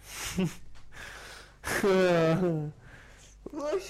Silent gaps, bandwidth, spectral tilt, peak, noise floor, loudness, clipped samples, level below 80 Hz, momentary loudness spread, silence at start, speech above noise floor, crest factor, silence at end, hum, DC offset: none; 15.5 kHz; -5.5 dB/octave; -18 dBFS; -52 dBFS; -28 LUFS; under 0.1%; -52 dBFS; 22 LU; 0 s; 25 dB; 12 dB; 0 s; none; under 0.1%